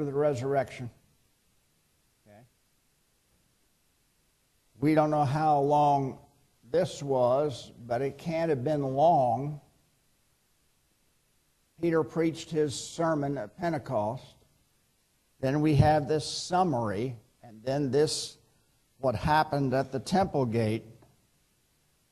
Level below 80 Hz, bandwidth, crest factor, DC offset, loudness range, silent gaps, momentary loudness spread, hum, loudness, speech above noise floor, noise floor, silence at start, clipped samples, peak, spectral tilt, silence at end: -56 dBFS; 13 kHz; 20 dB; under 0.1%; 6 LU; none; 12 LU; none; -28 LUFS; 43 dB; -70 dBFS; 0 s; under 0.1%; -10 dBFS; -6 dB/octave; 1.2 s